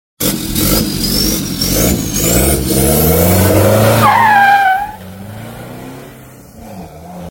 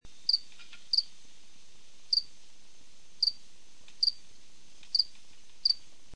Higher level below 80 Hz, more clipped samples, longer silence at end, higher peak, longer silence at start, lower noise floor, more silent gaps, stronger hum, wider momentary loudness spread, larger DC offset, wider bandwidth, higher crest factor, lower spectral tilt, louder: first, -26 dBFS vs -66 dBFS; neither; about the same, 0 s vs 0 s; first, 0 dBFS vs -12 dBFS; first, 0.2 s vs 0 s; second, -35 dBFS vs -60 dBFS; neither; neither; about the same, 22 LU vs 22 LU; second, under 0.1% vs 1%; first, 17.5 kHz vs 10.5 kHz; second, 12 dB vs 22 dB; first, -4 dB/octave vs 0.5 dB/octave; first, -11 LUFS vs -29 LUFS